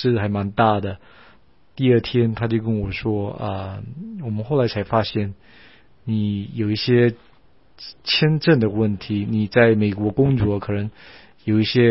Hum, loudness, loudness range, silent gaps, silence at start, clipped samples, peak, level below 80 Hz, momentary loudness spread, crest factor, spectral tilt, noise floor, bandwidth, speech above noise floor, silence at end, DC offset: none; -20 LUFS; 6 LU; none; 0 s; under 0.1%; 0 dBFS; -46 dBFS; 15 LU; 20 dB; -10.5 dB/octave; -56 dBFS; 5.8 kHz; 36 dB; 0 s; 0.3%